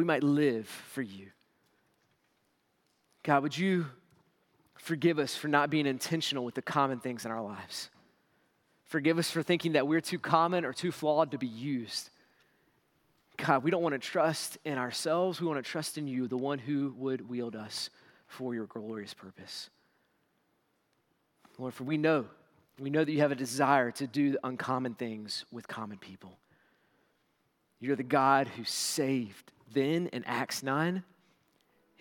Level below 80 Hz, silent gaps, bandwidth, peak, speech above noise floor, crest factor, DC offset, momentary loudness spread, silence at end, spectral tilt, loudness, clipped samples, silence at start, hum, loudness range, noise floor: -84 dBFS; none; 18 kHz; -10 dBFS; 44 dB; 24 dB; under 0.1%; 15 LU; 1 s; -5 dB/octave; -32 LUFS; under 0.1%; 0 s; none; 9 LU; -75 dBFS